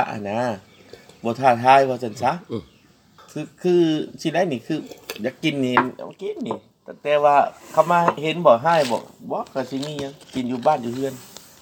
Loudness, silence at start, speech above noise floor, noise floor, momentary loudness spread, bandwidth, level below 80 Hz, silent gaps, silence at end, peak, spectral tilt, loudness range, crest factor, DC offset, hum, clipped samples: -21 LUFS; 0 s; 32 dB; -53 dBFS; 16 LU; 20 kHz; -66 dBFS; none; 0.35 s; 0 dBFS; -5.5 dB/octave; 5 LU; 22 dB; under 0.1%; none; under 0.1%